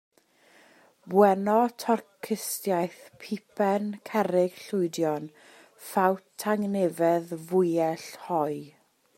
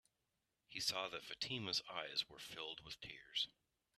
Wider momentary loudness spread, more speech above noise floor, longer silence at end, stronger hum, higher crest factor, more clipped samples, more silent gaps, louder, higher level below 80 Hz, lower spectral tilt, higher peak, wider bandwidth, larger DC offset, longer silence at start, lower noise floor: first, 13 LU vs 10 LU; second, 34 dB vs 42 dB; about the same, 0.5 s vs 0.45 s; neither; about the same, 22 dB vs 24 dB; neither; neither; first, -27 LUFS vs -44 LUFS; about the same, -78 dBFS vs -78 dBFS; first, -5.5 dB/octave vs -2 dB/octave; first, -6 dBFS vs -24 dBFS; first, 16 kHz vs 13.5 kHz; neither; first, 1.05 s vs 0.7 s; second, -60 dBFS vs -88 dBFS